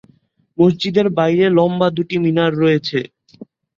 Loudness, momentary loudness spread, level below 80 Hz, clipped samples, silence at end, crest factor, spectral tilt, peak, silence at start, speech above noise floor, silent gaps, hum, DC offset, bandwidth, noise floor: -16 LUFS; 9 LU; -56 dBFS; under 0.1%; 0.35 s; 14 dB; -7.5 dB/octave; -2 dBFS; 0.6 s; 41 dB; none; none; under 0.1%; 7.4 kHz; -56 dBFS